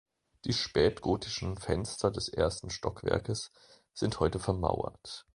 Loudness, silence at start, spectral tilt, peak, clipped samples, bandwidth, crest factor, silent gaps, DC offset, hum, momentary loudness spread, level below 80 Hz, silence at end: -32 LUFS; 0.45 s; -5 dB/octave; -12 dBFS; under 0.1%; 11.5 kHz; 22 dB; none; under 0.1%; none; 10 LU; -48 dBFS; 0.15 s